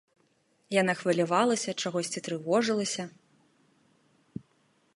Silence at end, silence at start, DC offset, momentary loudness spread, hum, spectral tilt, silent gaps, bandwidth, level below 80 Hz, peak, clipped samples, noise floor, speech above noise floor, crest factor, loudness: 1.85 s; 0.7 s; under 0.1%; 20 LU; none; -4 dB/octave; none; 11.5 kHz; -76 dBFS; -10 dBFS; under 0.1%; -69 dBFS; 41 dB; 22 dB; -28 LUFS